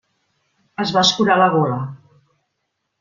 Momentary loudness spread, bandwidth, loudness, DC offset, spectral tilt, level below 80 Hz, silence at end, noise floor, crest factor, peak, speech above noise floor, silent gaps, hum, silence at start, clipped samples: 16 LU; 7.4 kHz; -16 LUFS; under 0.1%; -4.5 dB/octave; -60 dBFS; 1.05 s; -74 dBFS; 18 dB; -2 dBFS; 58 dB; none; none; 0.8 s; under 0.1%